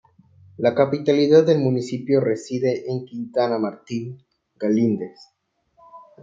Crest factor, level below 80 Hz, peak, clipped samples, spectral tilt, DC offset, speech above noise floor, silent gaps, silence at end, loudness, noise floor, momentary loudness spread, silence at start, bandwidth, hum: 18 dB; -68 dBFS; -2 dBFS; under 0.1%; -7 dB/octave; under 0.1%; 41 dB; none; 0.2 s; -21 LUFS; -61 dBFS; 14 LU; 0.6 s; 7.8 kHz; none